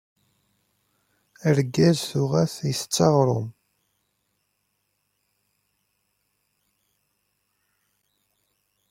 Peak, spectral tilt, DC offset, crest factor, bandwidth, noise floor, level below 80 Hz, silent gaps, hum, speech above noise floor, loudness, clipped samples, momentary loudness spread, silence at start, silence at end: -4 dBFS; -5.5 dB/octave; under 0.1%; 24 dB; 16.5 kHz; -74 dBFS; -64 dBFS; none; 50 Hz at -70 dBFS; 53 dB; -22 LUFS; under 0.1%; 9 LU; 1.45 s; 5.4 s